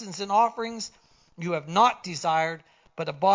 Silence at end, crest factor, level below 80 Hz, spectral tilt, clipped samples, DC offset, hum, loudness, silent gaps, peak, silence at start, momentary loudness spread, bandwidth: 0 s; 18 dB; -70 dBFS; -4 dB/octave; under 0.1%; under 0.1%; none; -26 LUFS; none; -8 dBFS; 0 s; 15 LU; 7.6 kHz